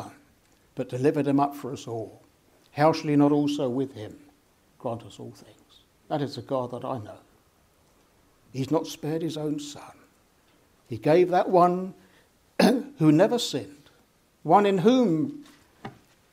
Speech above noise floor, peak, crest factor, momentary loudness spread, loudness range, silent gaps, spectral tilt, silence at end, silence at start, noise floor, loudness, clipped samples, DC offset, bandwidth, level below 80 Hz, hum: 38 dB; -6 dBFS; 20 dB; 22 LU; 12 LU; none; -6.5 dB/octave; 0.45 s; 0 s; -63 dBFS; -25 LUFS; under 0.1%; under 0.1%; 16 kHz; -68 dBFS; none